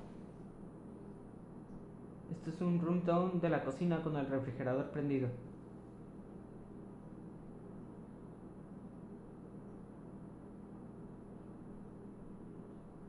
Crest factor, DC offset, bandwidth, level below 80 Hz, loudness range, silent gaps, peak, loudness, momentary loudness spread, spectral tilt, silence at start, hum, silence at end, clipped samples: 20 dB; under 0.1%; 10.5 kHz; -64 dBFS; 16 LU; none; -22 dBFS; -39 LUFS; 18 LU; -9 dB/octave; 0 s; none; 0 s; under 0.1%